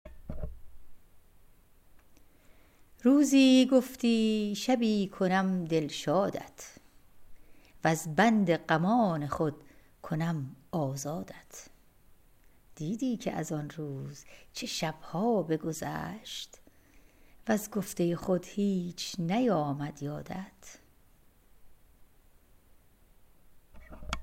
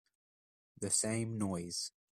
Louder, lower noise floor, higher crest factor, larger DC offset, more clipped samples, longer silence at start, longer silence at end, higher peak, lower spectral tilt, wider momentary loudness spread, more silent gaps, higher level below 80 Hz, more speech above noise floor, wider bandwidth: first, -30 LUFS vs -36 LUFS; second, -61 dBFS vs under -90 dBFS; about the same, 20 dB vs 20 dB; neither; neither; second, 0.05 s vs 0.8 s; second, 0 s vs 0.3 s; first, -10 dBFS vs -18 dBFS; first, -5.5 dB/octave vs -3.5 dB/octave; first, 19 LU vs 8 LU; neither; first, -56 dBFS vs -72 dBFS; second, 32 dB vs over 53 dB; about the same, 16 kHz vs 15.5 kHz